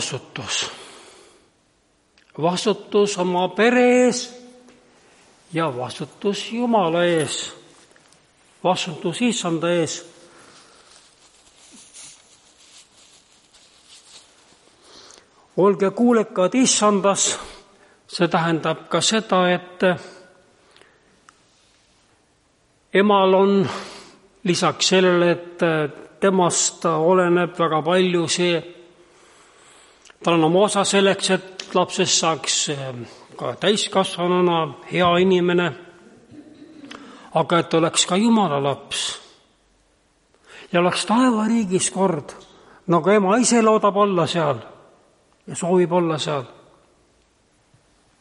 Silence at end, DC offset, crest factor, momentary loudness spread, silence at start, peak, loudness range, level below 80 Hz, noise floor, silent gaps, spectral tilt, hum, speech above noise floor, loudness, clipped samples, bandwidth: 1.75 s; under 0.1%; 18 dB; 14 LU; 0 s; -4 dBFS; 6 LU; -64 dBFS; -62 dBFS; none; -4 dB/octave; none; 43 dB; -19 LUFS; under 0.1%; 11.5 kHz